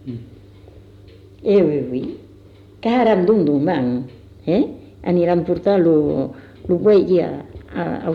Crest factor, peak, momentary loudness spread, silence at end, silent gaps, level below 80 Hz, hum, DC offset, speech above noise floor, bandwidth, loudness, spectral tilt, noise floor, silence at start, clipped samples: 14 dB; -6 dBFS; 17 LU; 0 s; none; -48 dBFS; none; under 0.1%; 27 dB; 5.4 kHz; -18 LUFS; -9.5 dB/octave; -44 dBFS; 0.05 s; under 0.1%